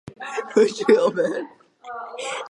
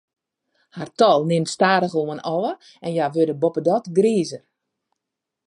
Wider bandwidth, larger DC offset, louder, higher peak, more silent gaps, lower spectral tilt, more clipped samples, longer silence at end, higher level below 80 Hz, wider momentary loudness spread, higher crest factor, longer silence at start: about the same, 11 kHz vs 11 kHz; neither; about the same, -21 LUFS vs -20 LUFS; about the same, -4 dBFS vs -2 dBFS; neither; about the same, -4.5 dB/octave vs -5.5 dB/octave; neither; second, 0.05 s vs 1.1 s; about the same, -68 dBFS vs -72 dBFS; first, 18 LU vs 13 LU; about the same, 20 dB vs 18 dB; second, 0.05 s vs 0.75 s